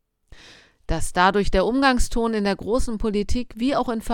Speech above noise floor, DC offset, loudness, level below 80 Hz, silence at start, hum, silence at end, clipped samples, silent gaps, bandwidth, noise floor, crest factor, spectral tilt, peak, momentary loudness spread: 29 dB; under 0.1%; -22 LUFS; -30 dBFS; 0.3 s; none; 0 s; under 0.1%; none; 16.5 kHz; -50 dBFS; 18 dB; -5 dB/octave; -2 dBFS; 7 LU